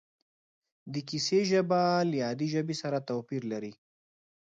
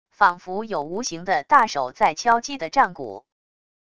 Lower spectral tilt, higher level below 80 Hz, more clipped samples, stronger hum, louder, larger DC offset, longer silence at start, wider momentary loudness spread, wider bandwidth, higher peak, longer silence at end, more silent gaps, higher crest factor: first, -5.5 dB/octave vs -3 dB/octave; second, -76 dBFS vs -60 dBFS; neither; neither; second, -30 LUFS vs -21 LUFS; second, under 0.1% vs 0.5%; first, 0.85 s vs 0.2 s; about the same, 13 LU vs 12 LU; second, 9 kHz vs 11 kHz; second, -14 dBFS vs -2 dBFS; about the same, 0.7 s vs 0.8 s; neither; about the same, 16 dB vs 20 dB